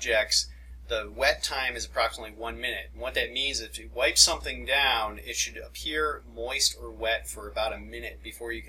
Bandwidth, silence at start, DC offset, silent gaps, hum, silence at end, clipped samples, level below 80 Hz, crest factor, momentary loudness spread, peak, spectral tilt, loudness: 17 kHz; 0 s; under 0.1%; none; none; 0 s; under 0.1%; -44 dBFS; 26 dB; 14 LU; -4 dBFS; -0.5 dB/octave; -27 LUFS